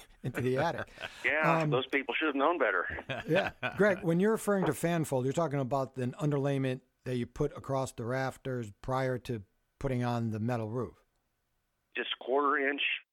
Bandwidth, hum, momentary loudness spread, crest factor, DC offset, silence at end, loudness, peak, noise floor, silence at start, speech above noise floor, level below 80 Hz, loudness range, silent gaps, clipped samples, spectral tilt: 17 kHz; none; 10 LU; 20 dB; under 0.1%; 0.1 s; -32 LUFS; -12 dBFS; -79 dBFS; 0 s; 48 dB; -58 dBFS; 6 LU; none; under 0.1%; -6 dB/octave